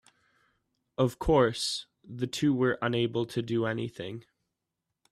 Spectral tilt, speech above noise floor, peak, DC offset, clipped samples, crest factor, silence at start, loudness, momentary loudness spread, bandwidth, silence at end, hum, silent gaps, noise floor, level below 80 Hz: -5.5 dB/octave; 57 dB; -12 dBFS; under 0.1%; under 0.1%; 18 dB; 1 s; -29 LUFS; 16 LU; 14 kHz; 0.9 s; none; none; -86 dBFS; -50 dBFS